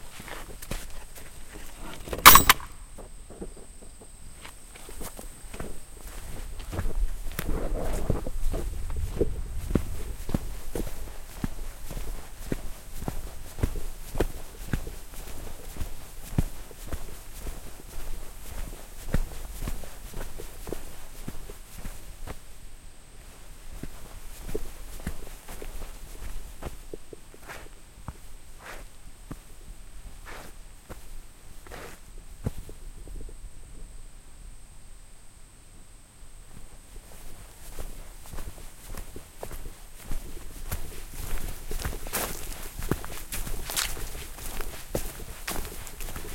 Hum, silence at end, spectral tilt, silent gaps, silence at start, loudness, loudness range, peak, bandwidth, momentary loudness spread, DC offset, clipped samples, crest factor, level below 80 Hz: none; 0 s; -2.5 dB/octave; none; 0 s; -29 LUFS; 25 LU; 0 dBFS; 16.5 kHz; 17 LU; under 0.1%; under 0.1%; 30 dB; -36 dBFS